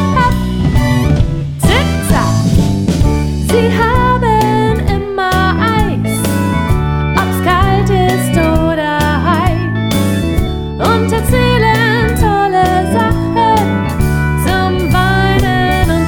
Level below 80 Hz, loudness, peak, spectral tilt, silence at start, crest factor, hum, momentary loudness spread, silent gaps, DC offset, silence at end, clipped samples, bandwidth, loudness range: -20 dBFS; -12 LUFS; 0 dBFS; -6 dB/octave; 0 s; 12 dB; none; 4 LU; none; under 0.1%; 0 s; under 0.1%; over 20 kHz; 1 LU